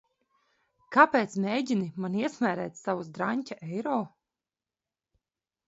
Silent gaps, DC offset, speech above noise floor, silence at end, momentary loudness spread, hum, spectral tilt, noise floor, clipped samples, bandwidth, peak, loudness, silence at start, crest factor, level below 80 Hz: none; under 0.1%; over 62 dB; 1.6 s; 12 LU; none; -6 dB/octave; under -90 dBFS; under 0.1%; 8 kHz; -4 dBFS; -28 LUFS; 0.9 s; 26 dB; -76 dBFS